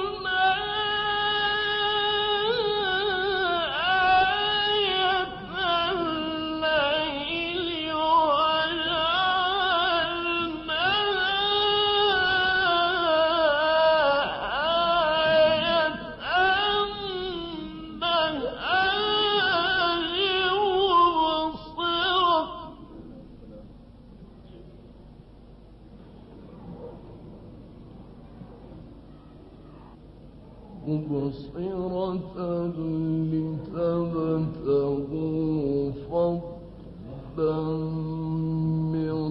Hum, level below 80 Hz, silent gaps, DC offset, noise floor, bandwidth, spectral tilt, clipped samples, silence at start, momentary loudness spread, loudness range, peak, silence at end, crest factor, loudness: none; -50 dBFS; none; under 0.1%; -48 dBFS; 5.8 kHz; -8 dB/octave; under 0.1%; 0 s; 12 LU; 9 LU; -10 dBFS; 0 s; 16 dB; -24 LUFS